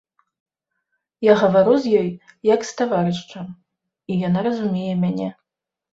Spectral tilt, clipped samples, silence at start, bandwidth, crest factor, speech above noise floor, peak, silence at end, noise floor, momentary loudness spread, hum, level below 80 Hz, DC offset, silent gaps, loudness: -7 dB/octave; under 0.1%; 1.2 s; 7.8 kHz; 18 dB; 66 dB; -2 dBFS; 0.6 s; -84 dBFS; 14 LU; none; -62 dBFS; under 0.1%; none; -20 LUFS